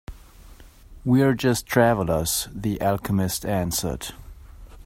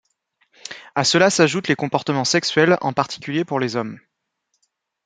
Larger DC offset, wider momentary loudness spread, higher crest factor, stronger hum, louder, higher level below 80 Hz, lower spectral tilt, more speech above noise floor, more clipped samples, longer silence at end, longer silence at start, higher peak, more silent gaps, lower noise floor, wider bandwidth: neither; second, 10 LU vs 14 LU; about the same, 20 dB vs 18 dB; neither; second, -23 LUFS vs -19 LUFS; first, -42 dBFS vs -64 dBFS; about the same, -5 dB/octave vs -4 dB/octave; second, 24 dB vs 54 dB; neither; second, 0 s vs 1.05 s; second, 0.1 s vs 0.7 s; about the same, -4 dBFS vs -2 dBFS; neither; second, -46 dBFS vs -73 dBFS; first, 16.5 kHz vs 9.6 kHz